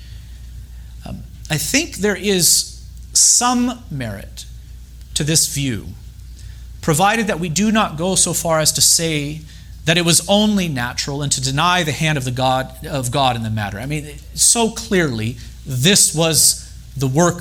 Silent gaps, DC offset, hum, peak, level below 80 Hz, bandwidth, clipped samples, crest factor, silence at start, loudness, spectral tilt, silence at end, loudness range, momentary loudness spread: none; under 0.1%; none; 0 dBFS; -38 dBFS; over 20 kHz; under 0.1%; 18 dB; 0 s; -16 LUFS; -3 dB/octave; 0 s; 4 LU; 21 LU